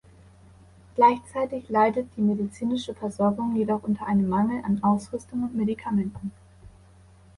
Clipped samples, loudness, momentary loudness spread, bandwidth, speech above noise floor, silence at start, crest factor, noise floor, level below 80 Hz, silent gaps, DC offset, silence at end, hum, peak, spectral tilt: under 0.1%; -25 LUFS; 11 LU; 11.5 kHz; 28 dB; 0.95 s; 20 dB; -53 dBFS; -56 dBFS; none; under 0.1%; 0.7 s; none; -6 dBFS; -7.5 dB/octave